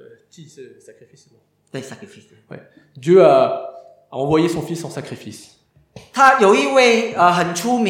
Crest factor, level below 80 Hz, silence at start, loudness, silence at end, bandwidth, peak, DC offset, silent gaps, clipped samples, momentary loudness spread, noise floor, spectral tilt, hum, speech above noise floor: 18 dB; -60 dBFS; 0.4 s; -15 LUFS; 0 s; 16 kHz; 0 dBFS; under 0.1%; none; under 0.1%; 22 LU; -45 dBFS; -4.5 dB/octave; none; 27 dB